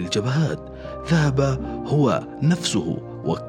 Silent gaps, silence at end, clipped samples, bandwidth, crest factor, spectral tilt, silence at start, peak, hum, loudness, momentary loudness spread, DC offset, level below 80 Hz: none; 0 s; under 0.1%; 11.5 kHz; 14 dB; -6 dB/octave; 0 s; -8 dBFS; none; -22 LUFS; 9 LU; under 0.1%; -42 dBFS